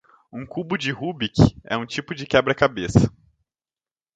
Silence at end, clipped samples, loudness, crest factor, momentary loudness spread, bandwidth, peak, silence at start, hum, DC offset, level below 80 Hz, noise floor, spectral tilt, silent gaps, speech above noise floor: 1.05 s; under 0.1%; -22 LUFS; 22 dB; 13 LU; 9.2 kHz; 0 dBFS; 0.35 s; none; under 0.1%; -40 dBFS; under -90 dBFS; -6.5 dB/octave; none; over 69 dB